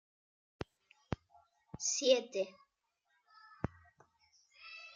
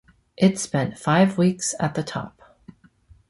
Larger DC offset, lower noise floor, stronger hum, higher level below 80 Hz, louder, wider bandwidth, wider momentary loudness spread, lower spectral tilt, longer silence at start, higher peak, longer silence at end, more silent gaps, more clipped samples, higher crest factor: neither; first, -82 dBFS vs -54 dBFS; neither; second, -66 dBFS vs -58 dBFS; second, -36 LUFS vs -22 LUFS; second, 9.6 kHz vs 11.5 kHz; first, 20 LU vs 12 LU; second, -3 dB/octave vs -5.5 dB/octave; first, 0.6 s vs 0.4 s; second, -16 dBFS vs -4 dBFS; second, 0.05 s vs 1 s; neither; neither; first, 26 dB vs 18 dB